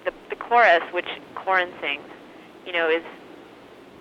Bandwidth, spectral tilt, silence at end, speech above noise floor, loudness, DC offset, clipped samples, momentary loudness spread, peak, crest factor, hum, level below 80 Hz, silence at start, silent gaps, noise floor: 8 kHz; -4 dB/octave; 0.55 s; 24 dB; -22 LUFS; under 0.1%; under 0.1%; 24 LU; -6 dBFS; 20 dB; none; -66 dBFS; 0.05 s; none; -46 dBFS